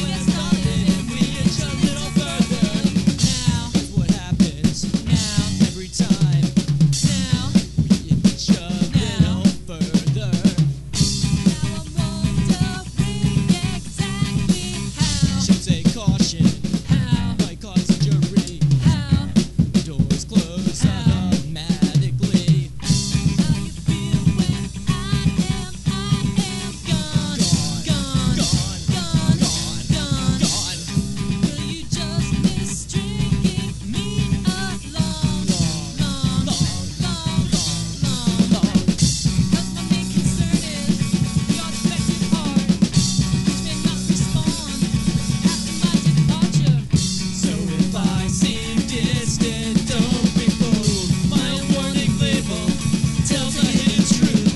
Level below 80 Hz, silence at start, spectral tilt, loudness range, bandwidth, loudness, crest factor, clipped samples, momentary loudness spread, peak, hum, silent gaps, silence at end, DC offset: -34 dBFS; 0 s; -5 dB/octave; 3 LU; 12 kHz; -20 LUFS; 16 dB; under 0.1%; 6 LU; -2 dBFS; none; none; 0 s; under 0.1%